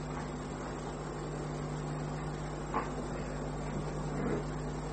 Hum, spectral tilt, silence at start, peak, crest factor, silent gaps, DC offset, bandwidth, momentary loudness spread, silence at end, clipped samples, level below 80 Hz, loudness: 50 Hz at -40 dBFS; -6.5 dB/octave; 0 s; -20 dBFS; 18 dB; none; under 0.1%; 8.8 kHz; 4 LU; 0 s; under 0.1%; -46 dBFS; -38 LUFS